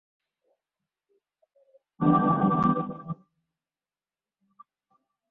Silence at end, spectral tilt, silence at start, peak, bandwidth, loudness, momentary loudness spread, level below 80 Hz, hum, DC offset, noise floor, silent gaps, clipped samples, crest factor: 2.15 s; -10.5 dB/octave; 2 s; -10 dBFS; 4 kHz; -24 LUFS; 18 LU; -62 dBFS; none; under 0.1%; under -90 dBFS; none; under 0.1%; 20 dB